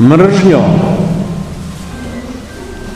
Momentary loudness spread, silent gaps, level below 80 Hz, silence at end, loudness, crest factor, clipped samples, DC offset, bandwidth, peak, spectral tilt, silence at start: 19 LU; none; -32 dBFS; 0 s; -10 LUFS; 12 dB; 2%; under 0.1%; 12.5 kHz; 0 dBFS; -7.5 dB/octave; 0 s